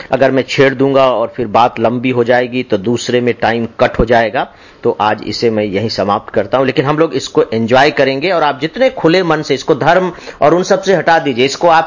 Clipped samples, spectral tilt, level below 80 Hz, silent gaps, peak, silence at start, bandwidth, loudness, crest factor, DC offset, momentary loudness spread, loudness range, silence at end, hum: under 0.1%; -5.5 dB/octave; -38 dBFS; none; 0 dBFS; 0 s; 7.4 kHz; -12 LUFS; 12 dB; under 0.1%; 5 LU; 2 LU; 0 s; none